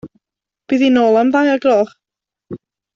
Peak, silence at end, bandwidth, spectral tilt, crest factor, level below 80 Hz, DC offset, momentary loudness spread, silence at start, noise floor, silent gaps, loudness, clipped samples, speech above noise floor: -2 dBFS; 0.4 s; 7.4 kHz; -5.5 dB/octave; 14 dB; -60 dBFS; under 0.1%; 22 LU; 0.05 s; -86 dBFS; none; -14 LUFS; under 0.1%; 73 dB